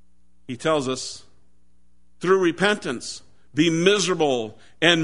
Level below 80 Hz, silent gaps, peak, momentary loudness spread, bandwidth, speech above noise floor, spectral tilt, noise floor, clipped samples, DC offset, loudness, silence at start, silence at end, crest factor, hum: -60 dBFS; none; -2 dBFS; 16 LU; 11 kHz; 42 dB; -4 dB/octave; -63 dBFS; under 0.1%; 0.5%; -22 LUFS; 0.5 s; 0 s; 22 dB; none